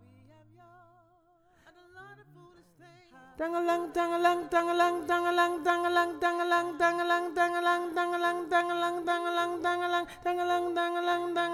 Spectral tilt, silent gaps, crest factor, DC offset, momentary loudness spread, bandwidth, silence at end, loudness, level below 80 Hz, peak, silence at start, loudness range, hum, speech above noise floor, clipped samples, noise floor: -3.5 dB/octave; none; 16 dB; under 0.1%; 4 LU; 15.5 kHz; 0 s; -29 LUFS; -68 dBFS; -14 dBFS; 1.95 s; 6 LU; none; 36 dB; under 0.1%; -65 dBFS